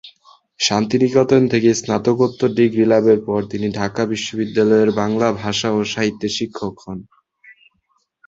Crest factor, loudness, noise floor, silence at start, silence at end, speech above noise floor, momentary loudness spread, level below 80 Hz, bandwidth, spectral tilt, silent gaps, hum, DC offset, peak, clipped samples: 16 dB; -17 LUFS; -66 dBFS; 0.05 s; 0.75 s; 49 dB; 9 LU; -54 dBFS; 7.8 kHz; -5 dB/octave; none; none; under 0.1%; -2 dBFS; under 0.1%